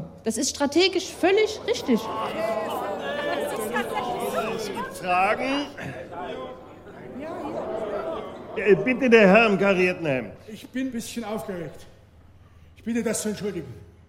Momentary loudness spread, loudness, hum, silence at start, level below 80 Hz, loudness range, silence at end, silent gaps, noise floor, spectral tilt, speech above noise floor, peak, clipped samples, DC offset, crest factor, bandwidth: 16 LU; -24 LUFS; none; 0 s; -56 dBFS; 11 LU; 0.2 s; none; -51 dBFS; -4.5 dB/octave; 28 dB; -4 dBFS; under 0.1%; under 0.1%; 22 dB; 16 kHz